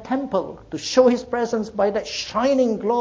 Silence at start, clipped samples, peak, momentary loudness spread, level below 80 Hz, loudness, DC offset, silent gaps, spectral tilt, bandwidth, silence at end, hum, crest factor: 0 s; under 0.1%; -4 dBFS; 9 LU; -54 dBFS; -21 LUFS; under 0.1%; none; -4.5 dB/octave; 7.8 kHz; 0 s; none; 18 dB